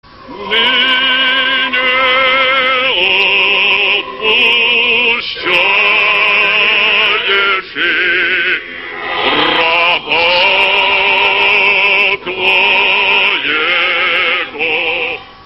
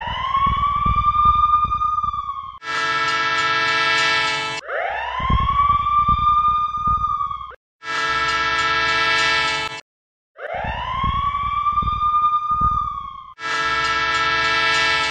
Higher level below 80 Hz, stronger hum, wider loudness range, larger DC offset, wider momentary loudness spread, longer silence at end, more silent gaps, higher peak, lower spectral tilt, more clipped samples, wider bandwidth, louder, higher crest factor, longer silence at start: second, -48 dBFS vs -34 dBFS; neither; about the same, 2 LU vs 3 LU; first, 0.2% vs under 0.1%; second, 5 LU vs 11 LU; about the same, 0.1 s vs 0 s; second, none vs 7.56-7.79 s, 9.82-10.35 s; first, 0 dBFS vs -4 dBFS; about the same, -3.5 dB/octave vs -3 dB/octave; neither; first, 13 kHz vs 9.8 kHz; first, -9 LUFS vs -18 LUFS; about the same, 12 dB vs 16 dB; first, 0.2 s vs 0 s